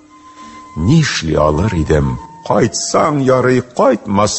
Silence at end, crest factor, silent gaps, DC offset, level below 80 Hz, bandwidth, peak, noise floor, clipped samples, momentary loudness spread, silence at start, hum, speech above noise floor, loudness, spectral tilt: 0 s; 14 dB; none; under 0.1%; -30 dBFS; 8.6 kHz; 0 dBFS; -38 dBFS; under 0.1%; 6 LU; 0.35 s; none; 25 dB; -14 LUFS; -5.5 dB/octave